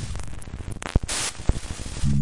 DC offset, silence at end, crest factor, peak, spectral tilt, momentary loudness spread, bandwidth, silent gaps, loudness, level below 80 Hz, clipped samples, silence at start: under 0.1%; 0 s; 22 dB; -4 dBFS; -4 dB/octave; 11 LU; 11.5 kHz; none; -29 LUFS; -30 dBFS; under 0.1%; 0 s